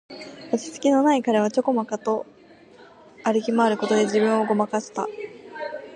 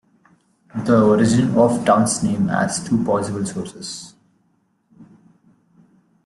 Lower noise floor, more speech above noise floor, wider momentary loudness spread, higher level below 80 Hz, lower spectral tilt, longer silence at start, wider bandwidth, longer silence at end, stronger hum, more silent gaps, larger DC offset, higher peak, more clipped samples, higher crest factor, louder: second, -49 dBFS vs -64 dBFS; second, 27 dB vs 46 dB; about the same, 16 LU vs 16 LU; second, -74 dBFS vs -54 dBFS; about the same, -5 dB/octave vs -5.5 dB/octave; second, 0.1 s vs 0.75 s; second, 10.5 kHz vs 12 kHz; second, 0 s vs 1.25 s; neither; neither; neither; second, -6 dBFS vs -2 dBFS; neither; about the same, 16 dB vs 18 dB; second, -23 LUFS vs -18 LUFS